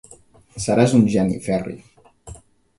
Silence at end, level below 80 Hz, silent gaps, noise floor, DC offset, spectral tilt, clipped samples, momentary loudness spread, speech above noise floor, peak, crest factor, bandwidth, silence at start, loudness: 0.45 s; -48 dBFS; none; -49 dBFS; under 0.1%; -6.5 dB/octave; under 0.1%; 21 LU; 31 dB; -2 dBFS; 20 dB; 11.5 kHz; 0.55 s; -19 LUFS